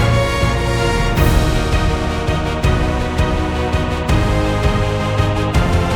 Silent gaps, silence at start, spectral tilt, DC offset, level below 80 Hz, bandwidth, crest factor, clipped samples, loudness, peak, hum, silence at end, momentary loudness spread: none; 0 s; -6 dB/octave; under 0.1%; -20 dBFS; 19 kHz; 14 dB; under 0.1%; -17 LUFS; -2 dBFS; none; 0 s; 4 LU